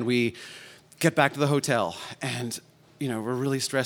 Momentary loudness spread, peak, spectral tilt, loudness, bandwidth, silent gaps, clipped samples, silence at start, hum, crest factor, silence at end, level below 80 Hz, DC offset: 15 LU; -4 dBFS; -4.5 dB/octave; -27 LUFS; 18.5 kHz; none; under 0.1%; 0 s; none; 22 dB; 0 s; -72 dBFS; under 0.1%